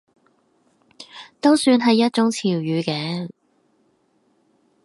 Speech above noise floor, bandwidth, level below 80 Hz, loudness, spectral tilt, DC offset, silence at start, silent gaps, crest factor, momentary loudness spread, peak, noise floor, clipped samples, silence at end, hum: 45 dB; 11.5 kHz; -70 dBFS; -19 LUFS; -5 dB/octave; under 0.1%; 1 s; none; 18 dB; 22 LU; -4 dBFS; -64 dBFS; under 0.1%; 1.55 s; none